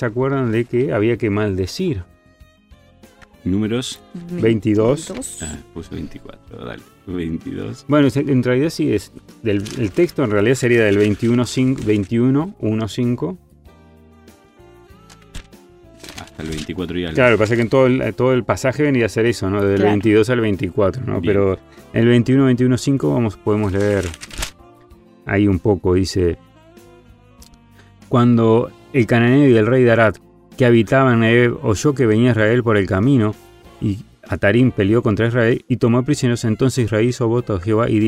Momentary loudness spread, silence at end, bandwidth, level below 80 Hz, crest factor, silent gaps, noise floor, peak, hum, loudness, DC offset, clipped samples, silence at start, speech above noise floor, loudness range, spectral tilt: 15 LU; 0 s; 14.5 kHz; -44 dBFS; 16 dB; none; -49 dBFS; -2 dBFS; none; -17 LUFS; under 0.1%; under 0.1%; 0 s; 33 dB; 8 LU; -6.5 dB/octave